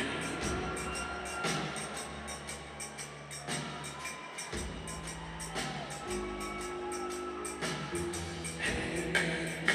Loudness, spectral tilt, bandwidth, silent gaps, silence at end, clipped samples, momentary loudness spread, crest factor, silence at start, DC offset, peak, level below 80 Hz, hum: -37 LUFS; -3.5 dB/octave; 15.5 kHz; none; 0 s; under 0.1%; 8 LU; 26 dB; 0 s; under 0.1%; -10 dBFS; -52 dBFS; none